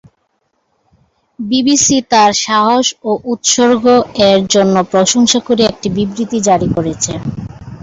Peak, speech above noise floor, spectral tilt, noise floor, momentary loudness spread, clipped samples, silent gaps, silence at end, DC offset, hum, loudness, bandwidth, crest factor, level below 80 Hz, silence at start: 0 dBFS; 52 dB; -3.5 dB/octave; -64 dBFS; 8 LU; under 0.1%; none; 0.05 s; under 0.1%; none; -12 LUFS; 8 kHz; 12 dB; -42 dBFS; 1.4 s